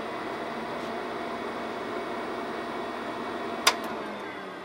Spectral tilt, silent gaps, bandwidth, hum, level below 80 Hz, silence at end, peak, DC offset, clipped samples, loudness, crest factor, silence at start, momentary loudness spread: -2.5 dB/octave; none; 16 kHz; none; -64 dBFS; 0 s; -2 dBFS; under 0.1%; under 0.1%; -32 LUFS; 30 dB; 0 s; 9 LU